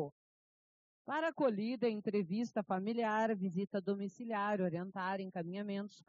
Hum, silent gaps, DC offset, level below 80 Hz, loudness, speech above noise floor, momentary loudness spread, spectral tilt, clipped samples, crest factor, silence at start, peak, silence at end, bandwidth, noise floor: none; 0.12-1.05 s; under 0.1%; -88 dBFS; -38 LUFS; over 53 dB; 7 LU; -5.5 dB/octave; under 0.1%; 16 dB; 0 s; -22 dBFS; 0.15 s; 7.4 kHz; under -90 dBFS